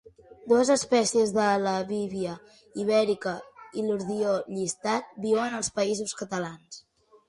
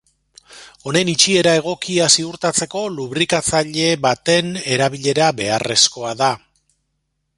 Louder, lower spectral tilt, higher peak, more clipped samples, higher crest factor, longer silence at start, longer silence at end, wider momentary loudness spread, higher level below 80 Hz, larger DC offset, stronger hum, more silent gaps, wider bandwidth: second, -27 LUFS vs -16 LUFS; about the same, -4 dB/octave vs -3 dB/octave; second, -10 dBFS vs 0 dBFS; neither; about the same, 18 dB vs 18 dB; about the same, 0.45 s vs 0.5 s; second, 0.5 s vs 1 s; first, 16 LU vs 7 LU; second, -66 dBFS vs -54 dBFS; neither; neither; neither; about the same, 11.5 kHz vs 11.5 kHz